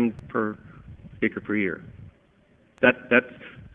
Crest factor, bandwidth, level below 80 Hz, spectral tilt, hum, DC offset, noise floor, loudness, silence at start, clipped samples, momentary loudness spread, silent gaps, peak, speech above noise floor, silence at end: 26 dB; 3.8 kHz; -56 dBFS; -8 dB/octave; none; under 0.1%; -60 dBFS; -24 LUFS; 0 s; under 0.1%; 23 LU; none; -2 dBFS; 35 dB; 0.1 s